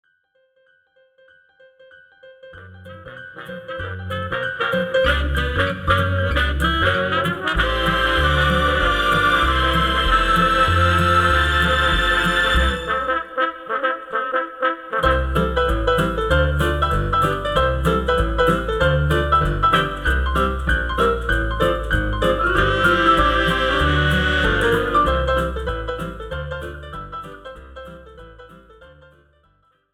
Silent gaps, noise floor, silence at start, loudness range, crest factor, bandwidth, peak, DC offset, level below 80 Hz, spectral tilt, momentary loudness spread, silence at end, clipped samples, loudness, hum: none; -63 dBFS; 2.25 s; 12 LU; 16 dB; 15.5 kHz; -2 dBFS; under 0.1%; -28 dBFS; -5.5 dB/octave; 14 LU; 1.05 s; under 0.1%; -18 LUFS; none